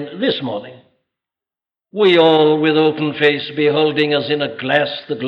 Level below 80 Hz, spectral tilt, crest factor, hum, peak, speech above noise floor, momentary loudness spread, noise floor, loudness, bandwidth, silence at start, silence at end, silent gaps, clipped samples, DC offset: -68 dBFS; -7 dB/octave; 16 dB; none; -2 dBFS; 74 dB; 10 LU; -89 dBFS; -15 LUFS; 5.8 kHz; 0 s; 0 s; none; under 0.1%; under 0.1%